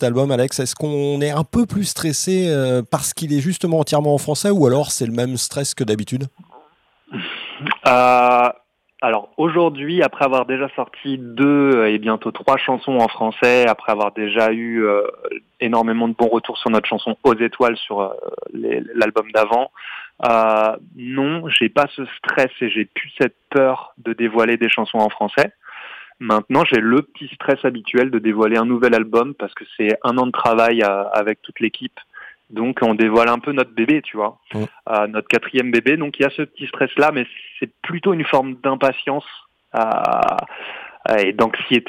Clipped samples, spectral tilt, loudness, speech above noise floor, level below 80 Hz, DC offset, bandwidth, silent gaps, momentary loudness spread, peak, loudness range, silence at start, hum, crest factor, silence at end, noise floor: under 0.1%; -5 dB/octave; -18 LUFS; 37 dB; -58 dBFS; under 0.1%; 16 kHz; none; 12 LU; 0 dBFS; 3 LU; 0 s; none; 18 dB; 0.05 s; -55 dBFS